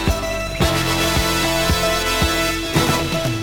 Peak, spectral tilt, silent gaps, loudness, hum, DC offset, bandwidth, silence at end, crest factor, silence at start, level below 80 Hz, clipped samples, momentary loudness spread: -4 dBFS; -3.5 dB/octave; none; -18 LUFS; none; under 0.1%; over 20 kHz; 0 s; 16 dB; 0 s; -28 dBFS; under 0.1%; 4 LU